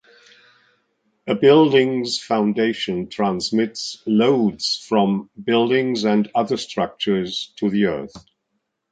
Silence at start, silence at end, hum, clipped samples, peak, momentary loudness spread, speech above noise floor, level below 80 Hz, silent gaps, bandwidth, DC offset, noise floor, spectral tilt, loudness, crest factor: 1.25 s; 0.7 s; none; under 0.1%; -2 dBFS; 10 LU; 55 dB; -60 dBFS; none; 9.2 kHz; under 0.1%; -74 dBFS; -5.5 dB/octave; -19 LUFS; 18 dB